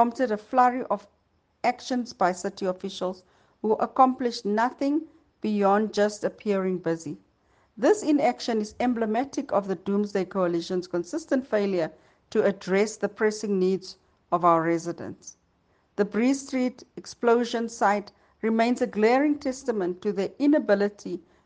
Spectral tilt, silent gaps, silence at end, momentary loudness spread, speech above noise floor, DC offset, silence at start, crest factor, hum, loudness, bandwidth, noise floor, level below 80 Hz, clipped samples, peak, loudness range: -5.5 dB/octave; none; 0.25 s; 10 LU; 42 dB; under 0.1%; 0 s; 20 dB; none; -26 LUFS; 9.8 kHz; -67 dBFS; -68 dBFS; under 0.1%; -6 dBFS; 2 LU